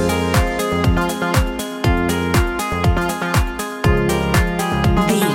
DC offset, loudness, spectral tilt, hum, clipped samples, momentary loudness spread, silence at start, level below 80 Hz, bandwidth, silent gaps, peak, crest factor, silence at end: under 0.1%; -18 LUFS; -5.5 dB/octave; none; under 0.1%; 3 LU; 0 s; -24 dBFS; 17 kHz; none; -2 dBFS; 14 dB; 0 s